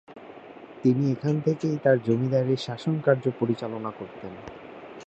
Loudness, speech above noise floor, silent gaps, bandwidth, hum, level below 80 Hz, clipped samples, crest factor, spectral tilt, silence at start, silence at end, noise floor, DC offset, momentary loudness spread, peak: -25 LUFS; 20 dB; none; 8.2 kHz; none; -64 dBFS; under 0.1%; 20 dB; -8 dB/octave; 0.1 s; 0.05 s; -45 dBFS; under 0.1%; 21 LU; -6 dBFS